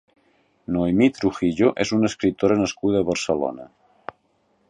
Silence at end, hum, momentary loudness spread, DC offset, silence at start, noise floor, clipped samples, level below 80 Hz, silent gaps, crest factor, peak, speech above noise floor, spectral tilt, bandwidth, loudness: 1.05 s; none; 21 LU; under 0.1%; 0.7 s; -65 dBFS; under 0.1%; -50 dBFS; none; 18 dB; -4 dBFS; 45 dB; -5.5 dB/octave; 10.5 kHz; -21 LUFS